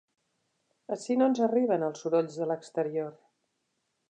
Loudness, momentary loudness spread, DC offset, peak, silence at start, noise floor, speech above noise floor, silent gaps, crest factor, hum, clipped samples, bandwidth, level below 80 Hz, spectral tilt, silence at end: -29 LUFS; 12 LU; under 0.1%; -14 dBFS; 0.9 s; -79 dBFS; 51 dB; none; 18 dB; none; under 0.1%; 9.4 kHz; -86 dBFS; -6.5 dB/octave; 0.95 s